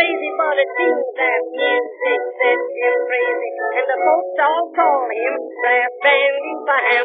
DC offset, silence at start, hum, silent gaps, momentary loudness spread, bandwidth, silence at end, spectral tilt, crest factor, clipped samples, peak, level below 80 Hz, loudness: under 0.1%; 0 s; none; none; 6 LU; 4.8 kHz; 0 s; 4 dB/octave; 16 dB; under 0.1%; -2 dBFS; under -90 dBFS; -17 LUFS